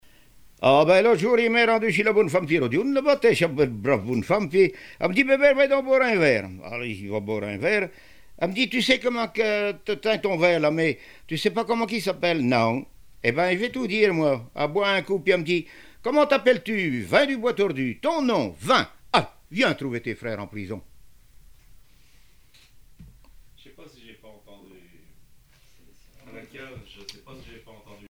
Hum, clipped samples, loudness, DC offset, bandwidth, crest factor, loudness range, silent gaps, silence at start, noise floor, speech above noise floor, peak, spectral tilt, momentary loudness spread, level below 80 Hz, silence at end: none; under 0.1%; -22 LUFS; 0.2%; 16 kHz; 20 dB; 6 LU; none; 0.6 s; -57 dBFS; 35 dB; -4 dBFS; -5.5 dB/octave; 13 LU; -56 dBFS; 0.15 s